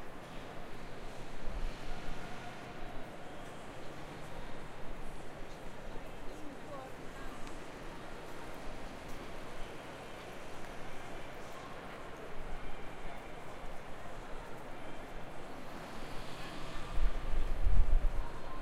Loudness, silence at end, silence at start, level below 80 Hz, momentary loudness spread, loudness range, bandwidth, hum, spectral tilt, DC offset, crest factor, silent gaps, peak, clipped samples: -46 LUFS; 0 s; 0 s; -40 dBFS; 8 LU; 6 LU; 11 kHz; none; -5.5 dB/octave; under 0.1%; 22 dB; none; -12 dBFS; under 0.1%